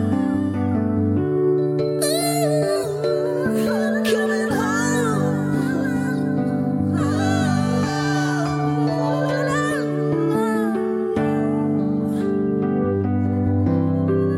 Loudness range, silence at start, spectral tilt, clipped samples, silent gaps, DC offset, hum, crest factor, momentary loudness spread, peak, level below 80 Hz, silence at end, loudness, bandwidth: 1 LU; 0 s; -6.5 dB/octave; under 0.1%; none; under 0.1%; none; 12 dB; 2 LU; -8 dBFS; -52 dBFS; 0 s; -21 LUFS; 16 kHz